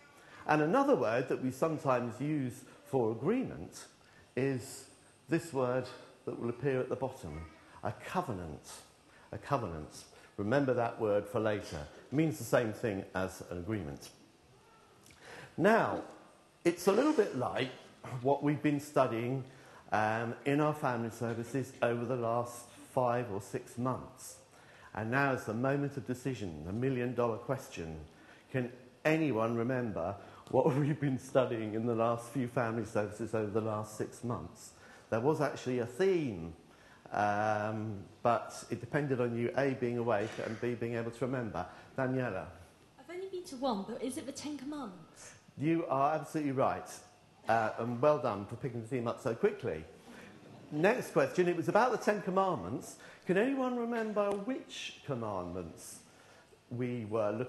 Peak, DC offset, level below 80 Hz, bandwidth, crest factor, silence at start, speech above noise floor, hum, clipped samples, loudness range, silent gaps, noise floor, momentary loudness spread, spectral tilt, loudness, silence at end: -12 dBFS; under 0.1%; -66 dBFS; 12.5 kHz; 22 dB; 0.25 s; 28 dB; none; under 0.1%; 6 LU; none; -62 dBFS; 17 LU; -6.5 dB/octave; -34 LUFS; 0 s